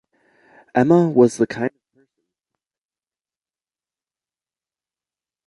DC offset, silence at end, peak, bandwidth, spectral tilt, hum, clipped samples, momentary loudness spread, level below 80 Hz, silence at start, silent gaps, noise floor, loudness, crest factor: under 0.1%; 3.8 s; -2 dBFS; 11.5 kHz; -7.5 dB/octave; none; under 0.1%; 12 LU; -64 dBFS; 0.75 s; none; under -90 dBFS; -18 LUFS; 22 dB